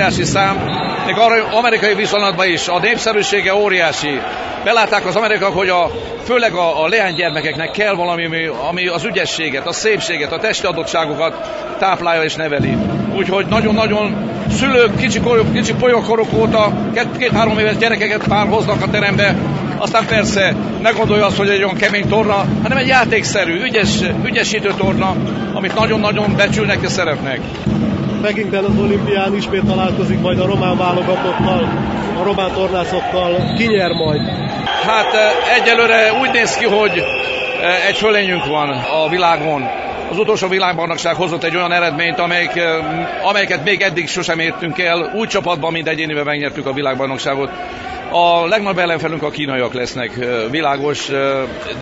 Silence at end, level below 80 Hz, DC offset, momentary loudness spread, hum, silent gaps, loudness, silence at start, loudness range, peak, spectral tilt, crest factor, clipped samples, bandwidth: 0 s; -40 dBFS; under 0.1%; 6 LU; none; none; -15 LUFS; 0 s; 4 LU; 0 dBFS; -4.5 dB/octave; 14 dB; under 0.1%; 8 kHz